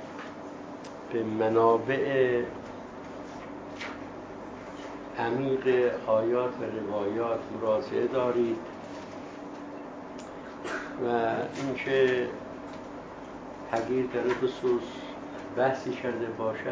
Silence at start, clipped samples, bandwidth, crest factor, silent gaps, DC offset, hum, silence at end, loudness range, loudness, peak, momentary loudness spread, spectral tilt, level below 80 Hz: 0 s; under 0.1%; 8 kHz; 20 dB; none; under 0.1%; none; 0 s; 5 LU; -29 LUFS; -10 dBFS; 16 LU; -6.5 dB/octave; -62 dBFS